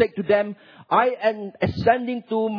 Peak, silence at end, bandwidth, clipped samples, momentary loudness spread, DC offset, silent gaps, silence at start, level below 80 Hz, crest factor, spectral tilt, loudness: -4 dBFS; 0 s; 5.4 kHz; under 0.1%; 6 LU; under 0.1%; none; 0 s; -54 dBFS; 18 dB; -8.5 dB/octave; -22 LUFS